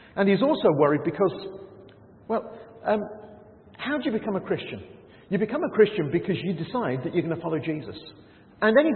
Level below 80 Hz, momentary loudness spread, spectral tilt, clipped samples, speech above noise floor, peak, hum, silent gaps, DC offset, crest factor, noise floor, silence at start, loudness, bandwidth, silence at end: -64 dBFS; 18 LU; -11 dB/octave; under 0.1%; 25 dB; -6 dBFS; none; none; under 0.1%; 20 dB; -50 dBFS; 0.15 s; -25 LUFS; 4.4 kHz; 0 s